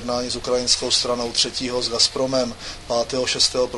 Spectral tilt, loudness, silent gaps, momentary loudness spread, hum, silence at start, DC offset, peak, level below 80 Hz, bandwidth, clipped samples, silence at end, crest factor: -2 dB/octave; -20 LUFS; none; 7 LU; none; 0 s; under 0.1%; -2 dBFS; -44 dBFS; 11.5 kHz; under 0.1%; 0 s; 20 dB